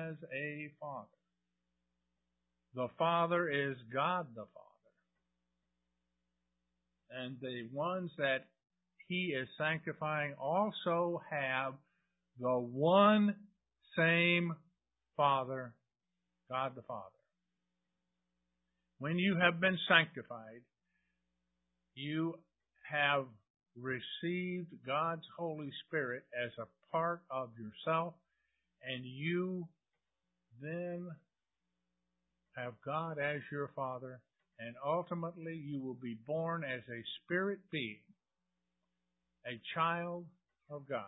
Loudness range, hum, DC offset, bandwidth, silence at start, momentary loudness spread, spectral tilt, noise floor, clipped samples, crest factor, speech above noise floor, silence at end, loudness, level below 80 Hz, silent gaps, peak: 10 LU; 60 Hz at -70 dBFS; under 0.1%; 3.9 kHz; 0 s; 18 LU; -2 dB/octave; under -90 dBFS; under 0.1%; 28 dB; over 53 dB; 0 s; -36 LUFS; -82 dBFS; 23.50-23.54 s; -12 dBFS